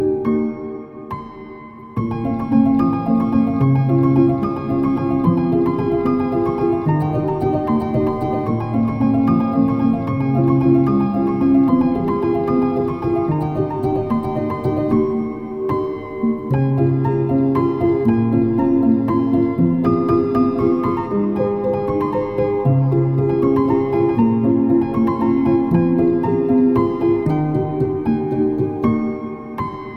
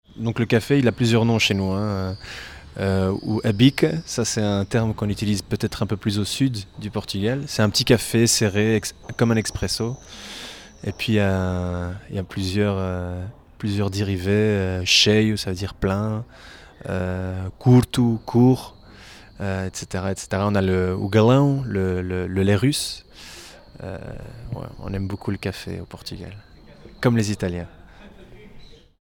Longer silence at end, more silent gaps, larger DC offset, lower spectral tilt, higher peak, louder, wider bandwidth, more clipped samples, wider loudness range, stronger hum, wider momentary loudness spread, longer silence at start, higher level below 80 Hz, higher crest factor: second, 0 s vs 0.35 s; neither; neither; first, -11 dB/octave vs -5 dB/octave; about the same, -4 dBFS vs -2 dBFS; first, -18 LUFS vs -22 LUFS; second, 5.6 kHz vs 18 kHz; neither; second, 3 LU vs 7 LU; neither; second, 7 LU vs 18 LU; second, 0 s vs 0.15 s; about the same, -42 dBFS vs -44 dBFS; second, 14 dB vs 20 dB